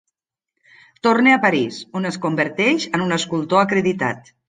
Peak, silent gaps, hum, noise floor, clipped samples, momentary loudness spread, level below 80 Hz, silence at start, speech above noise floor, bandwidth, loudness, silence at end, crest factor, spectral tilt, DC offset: -2 dBFS; none; none; -80 dBFS; under 0.1%; 10 LU; -62 dBFS; 1.05 s; 61 dB; 9.6 kHz; -18 LUFS; 0.3 s; 18 dB; -5 dB/octave; under 0.1%